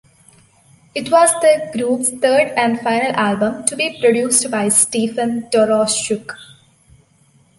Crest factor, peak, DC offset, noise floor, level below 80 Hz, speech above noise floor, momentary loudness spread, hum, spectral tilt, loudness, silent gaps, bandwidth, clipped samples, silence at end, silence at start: 18 dB; 0 dBFS; under 0.1%; -54 dBFS; -60 dBFS; 38 dB; 9 LU; none; -2.5 dB/octave; -15 LUFS; none; 12 kHz; under 0.1%; 1.15 s; 0.95 s